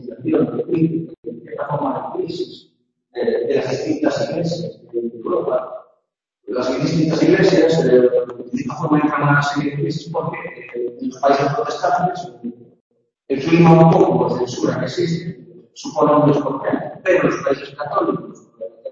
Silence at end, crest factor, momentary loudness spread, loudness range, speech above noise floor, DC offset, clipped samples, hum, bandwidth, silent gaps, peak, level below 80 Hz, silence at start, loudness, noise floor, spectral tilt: 0 s; 18 dB; 16 LU; 7 LU; 54 dB; under 0.1%; under 0.1%; none; 7.6 kHz; 1.18-1.23 s, 12.81-12.90 s; 0 dBFS; -56 dBFS; 0 s; -18 LUFS; -71 dBFS; -7 dB/octave